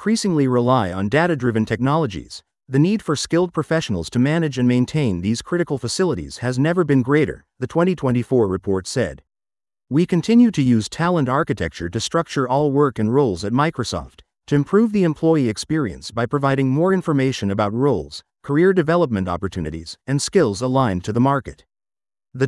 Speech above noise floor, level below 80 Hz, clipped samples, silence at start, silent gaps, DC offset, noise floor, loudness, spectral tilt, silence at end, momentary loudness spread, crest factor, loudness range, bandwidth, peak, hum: over 71 dB; -50 dBFS; under 0.1%; 0 s; none; under 0.1%; under -90 dBFS; -19 LUFS; -6.5 dB/octave; 0 s; 8 LU; 16 dB; 2 LU; 12 kHz; -4 dBFS; none